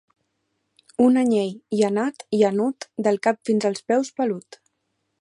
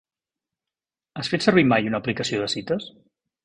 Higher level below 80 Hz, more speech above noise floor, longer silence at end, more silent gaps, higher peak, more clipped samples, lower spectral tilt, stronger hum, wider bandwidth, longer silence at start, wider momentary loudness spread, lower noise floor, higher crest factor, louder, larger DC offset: second, -70 dBFS vs -58 dBFS; second, 54 dB vs 68 dB; first, 0.8 s vs 0.55 s; neither; about the same, -6 dBFS vs -4 dBFS; neither; about the same, -6 dB/octave vs -5 dB/octave; neither; about the same, 11 kHz vs 10.5 kHz; second, 1 s vs 1.15 s; second, 8 LU vs 13 LU; second, -75 dBFS vs -90 dBFS; about the same, 16 dB vs 20 dB; about the same, -22 LUFS vs -22 LUFS; neither